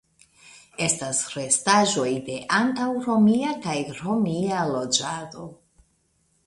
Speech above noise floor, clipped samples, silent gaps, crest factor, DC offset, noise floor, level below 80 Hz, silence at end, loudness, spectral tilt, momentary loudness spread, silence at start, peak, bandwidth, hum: 44 dB; under 0.1%; none; 20 dB; under 0.1%; -67 dBFS; -62 dBFS; 0.9 s; -23 LUFS; -3.5 dB/octave; 12 LU; 0.45 s; -4 dBFS; 11.5 kHz; none